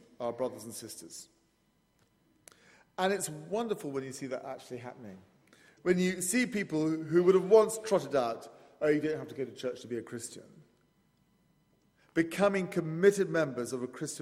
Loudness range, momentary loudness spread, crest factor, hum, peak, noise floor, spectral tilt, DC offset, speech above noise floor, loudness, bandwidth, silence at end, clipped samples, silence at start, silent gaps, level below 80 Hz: 10 LU; 18 LU; 22 dB; none; -10 dBFS; -72 dBFS; -5 dB/octave; under 0.1%; 41 dB; -31 LUFS; 16 kHz; 0 s; under 0.1%; 0.2 s; none; -74 dBFS